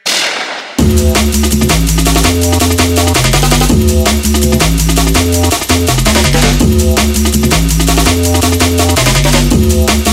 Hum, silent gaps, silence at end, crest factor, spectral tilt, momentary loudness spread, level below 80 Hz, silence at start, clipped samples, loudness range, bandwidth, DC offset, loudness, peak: none; none; 0 s; 10 dB; -4 dB/octave; 2 LU; -14 dBFS; 0.05 s; under 0.1%; 0 LU; 16.5 kHz; under 0.1%; -10 LUFS; 0 dBFS